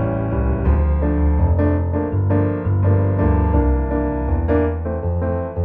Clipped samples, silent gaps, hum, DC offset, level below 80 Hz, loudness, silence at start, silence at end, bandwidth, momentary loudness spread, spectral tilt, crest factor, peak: under 0.1%; none; none; under 0.1%; -22 dBFS; -19 LUFS; 0 s; 0 s; 3 kHz; 4 LU; -13 dB/octave; 12 dB; -4 dBFS